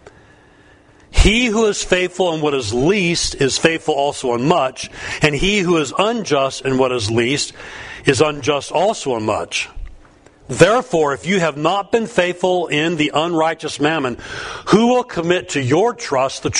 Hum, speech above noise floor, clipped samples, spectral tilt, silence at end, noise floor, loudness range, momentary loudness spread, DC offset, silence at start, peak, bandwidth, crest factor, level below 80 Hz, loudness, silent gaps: none; 31 dB; under 0.1%; -4 dB/octave; 0 s; -48 dBFS; 2 LU; 7 LU; under 0.1%; 0.05 s; 0 dBFS; 11 kHz; 18 dB; -30 dBFS; -17 LUFS; none